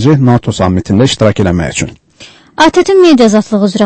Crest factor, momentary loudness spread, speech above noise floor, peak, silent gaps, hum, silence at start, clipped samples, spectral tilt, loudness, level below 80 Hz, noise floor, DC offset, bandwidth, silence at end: 8 dB; 10 LU; 29 dB; 0 dBFS; none; none; 0 s; 0.6%; -6 dB/octave; -9 LUFS; -34 dBFS; -37 dBFS; under 0.1%; 9.8 kHz; 0 s